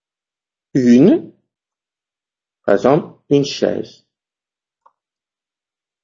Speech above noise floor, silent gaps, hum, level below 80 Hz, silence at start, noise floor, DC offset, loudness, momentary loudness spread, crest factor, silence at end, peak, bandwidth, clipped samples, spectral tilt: 77 dB; none; none; -60 dBFS; 0.75 s; -90 dBFS; under 0.1%; -15 LUFS; 15 LU; 18 dB; 2.15 s; 0 dBFS; 7.4 kHz; under 0.1%; -7 dB/octave